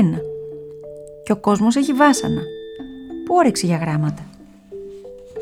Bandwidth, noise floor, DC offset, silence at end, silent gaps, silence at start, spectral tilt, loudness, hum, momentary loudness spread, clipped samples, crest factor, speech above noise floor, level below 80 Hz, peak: 15.5 kHz; -39 dBFS; under 0.1%; 0 s; none; 0 s; -5.5 dB/octave; -18 LUFS; none; 21 LU; under 0.1%; 18 dB; 22 dB; -52 dBFS; -2 dBFS